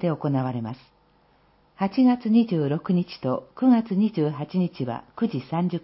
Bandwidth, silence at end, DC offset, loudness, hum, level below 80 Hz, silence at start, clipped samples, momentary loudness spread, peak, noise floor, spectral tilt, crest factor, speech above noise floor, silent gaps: 5.8 kHz; 0.05 s; under 0.1%; -24 LUFS; none; -64 dBFS; 0 s; under 0.1%; 10 LU; -10 dBFS; -61 dBFS; -12.5 dB/octave; 14 dB; 37 dB; none